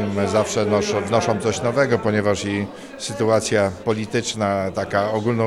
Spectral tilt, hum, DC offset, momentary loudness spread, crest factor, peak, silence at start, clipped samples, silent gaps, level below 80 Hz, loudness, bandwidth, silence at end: -5 dB/octave; none; under 0.1%; 6 LU; 18 dB; -4 dBFS; 0 s; under 0.1%; none; -52 dBFS; -21 LUFS; 14 kHz; 0 s